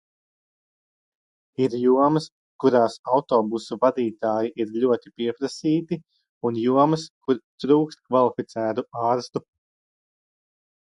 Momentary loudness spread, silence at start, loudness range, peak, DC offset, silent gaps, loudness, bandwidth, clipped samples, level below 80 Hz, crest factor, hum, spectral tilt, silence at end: 9 LU; 1.6 s; 3 LU; -4 dBFS; under 0.1%; 2.32-2.59 s, 2.99-3.04 s, 6.29-6.41 s, 7.10-7.21 s, 7.44-7.58 s; -23 LUFS; 11 kHz; under 0.1%; -70 dBFS; 20 dB; none; -7 dB/octave; 1.55 s